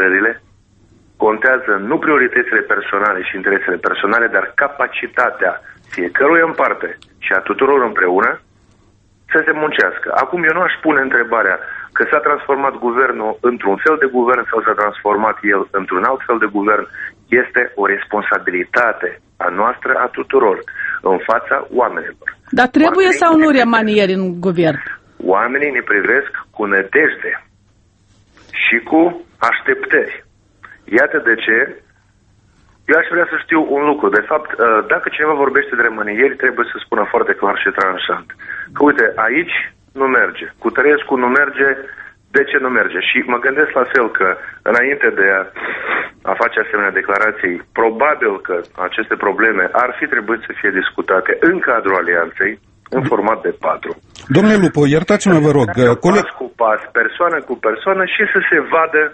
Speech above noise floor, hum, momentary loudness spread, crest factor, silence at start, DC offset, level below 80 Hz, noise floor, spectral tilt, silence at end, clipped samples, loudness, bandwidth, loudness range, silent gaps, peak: 39 dB; none; 8 LU; 16 dB; 0 s; under 0.1%; -54 dBFS; -53 dBFS; -6 dB/octave; 0 s; under 0.1%; -14 LUFS; 8.4 kHz; 3 LU; none; 0 dBFS